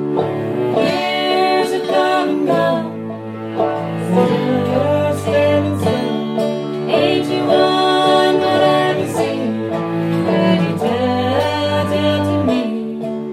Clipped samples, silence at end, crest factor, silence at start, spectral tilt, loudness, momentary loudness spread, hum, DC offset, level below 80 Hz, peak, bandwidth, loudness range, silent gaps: under 0.1%; 0 s; 16 dB; 0 s; -6 dB/octave; -16 LUFS; 7 LU; none; under 0.1%; -60 dBFS; 0 dBFS; 15 kHz; 2 LU; none